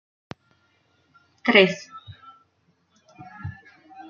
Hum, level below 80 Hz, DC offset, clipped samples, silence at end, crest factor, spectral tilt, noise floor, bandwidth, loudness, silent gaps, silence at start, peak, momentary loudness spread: none; -68 dBFS; under 0.1%; under 0.1%; 0.1 s; 26 dB; -5 dB/octave; -67 dBFS; 7.2 kHz; -19 LUFS; none; 1.45 s; -2 dBFS; 28 LU